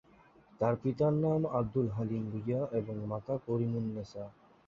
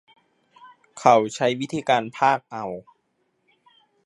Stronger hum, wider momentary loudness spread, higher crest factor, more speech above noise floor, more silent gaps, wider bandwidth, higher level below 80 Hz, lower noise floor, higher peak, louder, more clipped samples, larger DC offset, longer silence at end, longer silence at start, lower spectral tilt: neither; second, 9 LU vs 15 LU; second, 18 dB vs 24 dB; second, 29 dB vs 50 dB; neither; second, 7.2 kHz vs 11.5 kHz; first, -62 dBFS vs -70 dBFS; second, -62 dBFS vs -71 dBFS; second, -16 dBFS vs -2 dBFS; second, -34 LUFS vs -22 LUFS; neither; neither; second, 0.35 s vs 1.25 s; about the same, 0.6 s vs 0.65 s; first, -10 dB/octave vs -4.5 dB/octave